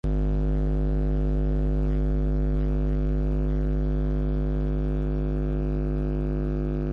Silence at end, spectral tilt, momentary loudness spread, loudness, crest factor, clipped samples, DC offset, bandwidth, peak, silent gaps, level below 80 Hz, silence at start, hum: 0 s; -10.5 dB/octave; 2 LU; -27 LUFS; 10 dB; under 0.1%; under 0.1%; 3.8 kHz; -14 dBFS; none; -26 dBFS; 0.05 s; 50 Hz at -25 dBFS